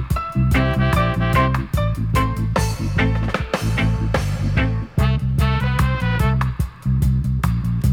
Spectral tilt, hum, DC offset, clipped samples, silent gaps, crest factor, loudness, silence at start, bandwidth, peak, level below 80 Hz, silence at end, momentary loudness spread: -6.5 dB/octave; none; under 0.1%; under 0.1%; none; 12 dB; -20 LUFS; 0 s; 17 kHz; -6 dBFS; -24 dBFS; 0 s; 4 LU